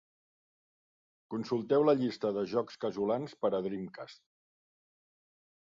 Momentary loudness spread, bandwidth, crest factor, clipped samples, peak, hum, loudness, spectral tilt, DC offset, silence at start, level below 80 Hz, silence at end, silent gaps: 14 LU; 7.6 kHz; 18 dB; under 0.1%; -16 dBFS; none; -32 LUFS; -7.5 dB/octave; under 0.1%; 1.3 s; -76 dBFS; 1.45 s; none